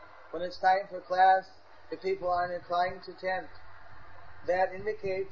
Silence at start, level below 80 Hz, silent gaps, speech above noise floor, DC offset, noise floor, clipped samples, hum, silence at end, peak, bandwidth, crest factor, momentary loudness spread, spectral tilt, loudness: 0 s; -62 dBFS; none; 22 dB; 0.4%; -52 dBFS; under 0.1%; none; 0 s; -12 dBFS; 6.8 kHz; 18 dB; 14 LU; -5.5 dB/octave; -30 LUFS